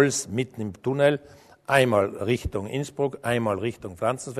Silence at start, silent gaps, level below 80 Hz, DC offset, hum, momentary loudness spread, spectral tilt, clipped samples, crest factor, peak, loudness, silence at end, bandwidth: 0 s; none; -48 dBFS; under 0.1%; none; 10 LU; -5 dB/octave; under 0.1%; 22 dB; -4 dBFS; -25 LUFS; 0 s; 13.5 kHz